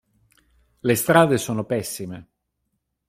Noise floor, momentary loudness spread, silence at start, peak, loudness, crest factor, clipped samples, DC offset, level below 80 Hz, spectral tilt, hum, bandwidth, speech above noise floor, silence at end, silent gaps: -76 dBFS; 17 LU; 0.85 s; -2 dBFS; -21 LUFS; 22 dB; under 0.1%; under 0.1%; -58 dBFS; -5 dB/octave; none; 16 kHz; 55 dB; 0.85 s; none